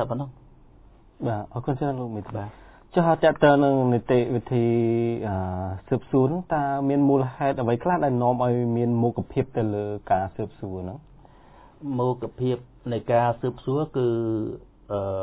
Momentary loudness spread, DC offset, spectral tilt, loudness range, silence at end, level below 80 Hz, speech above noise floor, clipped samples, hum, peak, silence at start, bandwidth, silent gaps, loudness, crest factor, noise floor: 13 LU; under 0.1%; -12 dB/octave; 7 LU; 0 s; -50 dBFS; 28 dB; under 0.1%; none; -4 dBFS; 0 s; 4 kHz; none; -24 LUFS; 20 dB; -52 dBFS